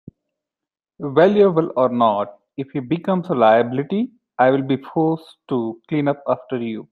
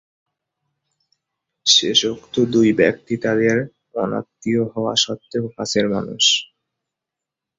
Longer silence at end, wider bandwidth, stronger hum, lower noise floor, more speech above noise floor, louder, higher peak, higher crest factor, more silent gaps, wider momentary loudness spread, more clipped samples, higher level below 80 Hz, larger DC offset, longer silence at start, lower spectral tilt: second, 0.1 s vs 1.15 s; second, 6.4 kHz vs 8 kHz; neither; about the same, -88 dBFS vs -85 dBFS; first, 70 dB vs 66 dB; about the same, -19 LUFS vs -18 LUFS; about the same, -2 dBFS vs -2 dBFS; about the same, 18 dB vs 20 dB; neither; about the same, 13 LU vs 11 LU; neither; second, -64 dBFS vs -58 dBFS; neither; second, 1 s vs 1.65 s; first, -9 dB/octave vs -3 dB/octave